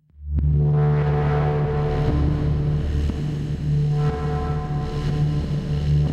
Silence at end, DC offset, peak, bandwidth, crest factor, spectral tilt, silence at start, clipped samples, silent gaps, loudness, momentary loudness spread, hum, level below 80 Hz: 0 s; under 0.1%; -10 dBFS; 6.8 kHz; 12 dB; -9 dB/octave; 0.2 s; under 0.1%; none; -22 LUFS; 6 LU; none; -28 dBFS